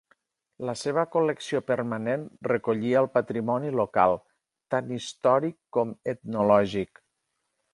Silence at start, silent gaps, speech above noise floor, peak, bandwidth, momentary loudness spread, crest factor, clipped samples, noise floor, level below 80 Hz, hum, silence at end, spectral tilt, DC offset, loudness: 0.6 s; none; 53 dB; -6 dBFS; 11.5 kHz; 10 LU; 20 dB; under 0.1%; -79 dBFS; -64 dBFS; none; 0.9 s; -6 dB/octave; under 0.1%; -26 LUFS